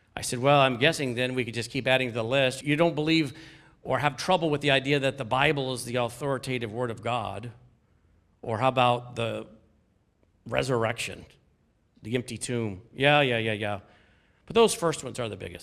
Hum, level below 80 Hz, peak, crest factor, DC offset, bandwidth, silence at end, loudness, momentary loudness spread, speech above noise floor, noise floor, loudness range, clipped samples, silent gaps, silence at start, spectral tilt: none; -58 dBFS; -4 dBFS; 22 dB; under 0.1%; 15 kHz; 0 s; -26 LUFS; 12 LU; 40 dB; -67 dBFS; 7 LU; under 0.1%; none; 0.15 s; -4.5 dB/octave